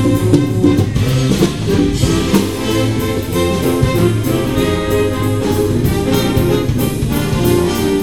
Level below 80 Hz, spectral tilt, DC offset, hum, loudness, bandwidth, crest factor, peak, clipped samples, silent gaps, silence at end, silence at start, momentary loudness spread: -28 dBFS; -6 dB/octave; 1%; none; -14 LUFS; 18 kHz; 14 dB; 0 dBFS; under 0.1%; none; 0 s; 0 s; 3 LU